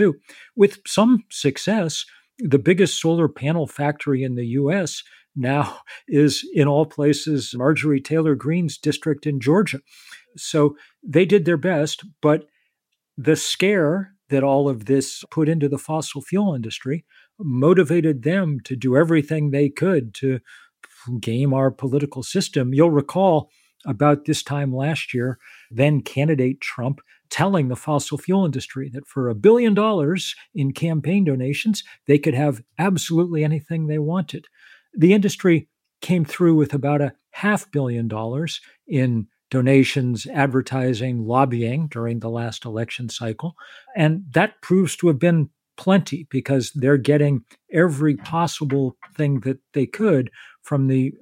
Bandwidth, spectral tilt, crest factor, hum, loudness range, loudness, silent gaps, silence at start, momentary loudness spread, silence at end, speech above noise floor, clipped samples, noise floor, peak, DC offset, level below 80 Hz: 16 kHz; -6.5 dB/octave; 18 dB; none; 3 LU; -20 LUFS; none; 0 s; 11 LU; 0.05 s; 57 dB; under 0.1%; -77 dBFS; -2 dBFS; under 0.1%; -64 dBFS